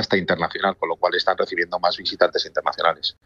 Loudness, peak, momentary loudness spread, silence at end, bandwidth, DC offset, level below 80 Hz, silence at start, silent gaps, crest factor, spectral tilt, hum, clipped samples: -21 LUFS; -4 dBFS; 3 LU; 0.15 s; 7.4 kHz; under 0.1%; -60 dBFS; 0 s; none; 18 dB; -4.5 dB/octave; none; under 0.1%